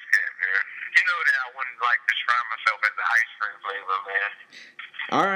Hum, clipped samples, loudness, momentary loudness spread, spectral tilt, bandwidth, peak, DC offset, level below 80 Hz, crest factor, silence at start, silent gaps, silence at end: none; under 0.1%; -23 LUFS; 12 LU; -2 dB/octave; 16 kHz; -4 dBFS; under 0.1%; -90 dBFS; 22 dB; 0 s; none; 0 s